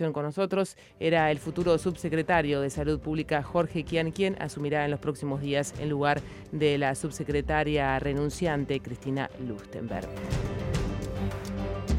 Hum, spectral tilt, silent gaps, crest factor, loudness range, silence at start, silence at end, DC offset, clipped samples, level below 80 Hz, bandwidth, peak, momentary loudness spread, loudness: none; -6 dB/octave; none; 18 dB; 4 LU; 0 s; 0 s; under 0.1%; under 0.1%; -44 dBFS; 15.5 kHz; -10 dBFS; 8 LU; -29 LUFS